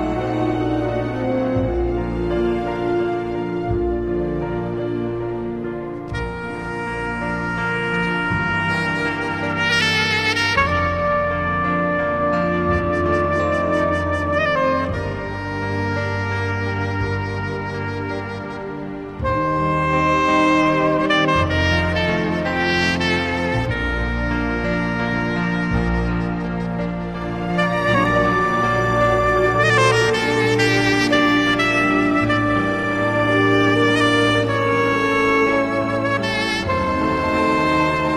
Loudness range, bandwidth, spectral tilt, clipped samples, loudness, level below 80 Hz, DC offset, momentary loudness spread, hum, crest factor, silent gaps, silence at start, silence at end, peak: 7 LU; 14 kHz; -5.5 dB/octave; under 0.1%; -19 LUFS; -36 dBFS; under 0.1%; 9 LU; none; 16 dB; none; 0 s; 0 s; -2 dBFS